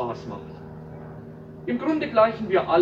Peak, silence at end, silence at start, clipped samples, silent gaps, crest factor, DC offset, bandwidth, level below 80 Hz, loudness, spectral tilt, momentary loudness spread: -6 dBFS; 0 s; 0 s; under 0.1%; none; 18 dB; under 0.1%; 7.2 kHz; -56 dBFS; -23 LUFS; -7.5 dB/octave; 20 LU